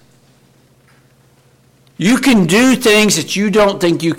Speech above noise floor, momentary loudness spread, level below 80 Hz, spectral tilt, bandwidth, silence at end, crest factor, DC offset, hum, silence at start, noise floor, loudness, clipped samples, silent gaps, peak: 39 dB; 5 LU; -46 dBFS; -4 dB/octave; 17 kHz; 0 s; 12 dB; under 0.1%; none; 2 s; -51 dBFS; -12 LUFS; under 0.1%; none; -4 dBFS